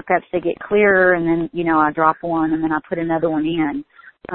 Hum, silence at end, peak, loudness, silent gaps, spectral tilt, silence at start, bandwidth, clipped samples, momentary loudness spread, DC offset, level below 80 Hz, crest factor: none; 0 s; -2 dBFS; -18 LUFS; none; -11.5 dB/octave; 0.05 s; 4.1 kHz; under 0.1%; 8 LU; under 0.1%; -50 dBFS; 16 dB